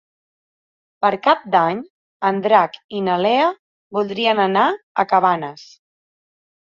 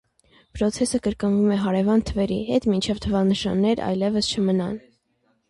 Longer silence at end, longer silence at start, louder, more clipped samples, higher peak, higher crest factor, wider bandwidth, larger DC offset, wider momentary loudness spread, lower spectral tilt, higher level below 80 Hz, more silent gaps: first, 1 s vs 0.7 s; first, 1 s vs 0.55 s; first, -18 LUFS vs -22 LUFS; neither; first, -2 dBFS vs -8 dBFS; about the same, 18 dB vs 14 dB; second, 7.2 kHz vs 11.5 kHz; neither; first, 9 LU vs 5 LU; about the same, -6 dB/octave vs -6 dB/octave; second, -68 dBFS vs -44 dBFS; first, 1.90-2.20 s, 2.84-2.89 s, 3.59-3.90 s, 4.83-4.95 s vs none